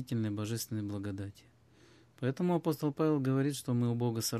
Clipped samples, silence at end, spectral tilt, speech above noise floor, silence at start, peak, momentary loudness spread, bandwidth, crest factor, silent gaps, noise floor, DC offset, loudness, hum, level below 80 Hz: under 0.1%; 0 s; -6 dB/octave; 29 dB; 0 s; -20 dBFS; 8 LU; 15 kHz; 14 dB; none; -62 dBFS; under 0.1%; -34 LUFS; none; -66 dBFS